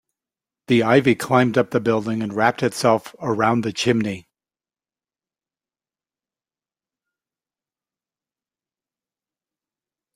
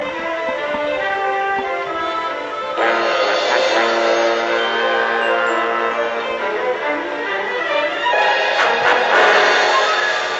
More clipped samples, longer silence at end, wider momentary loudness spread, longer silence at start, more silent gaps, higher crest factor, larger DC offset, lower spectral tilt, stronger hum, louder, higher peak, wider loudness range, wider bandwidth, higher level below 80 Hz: neither; first, 5.95 s vs 0 s; about the same, 7 LU vs 8 LU; first, 0.7 s vs 0 s; neither; first, 22 dB vs 16 dB; neither; first, -5.5 dB/octave vs -2 dB/octave; neither; about the same, -19 LUFS vs -17 LUFS; about the same, -2 dBFS vs 0 dBFS; first, 9 LU vs 4 LU; first, 16 kHz vs 8.2 kHz; about the same, -62 dBFS vs -58 dBFS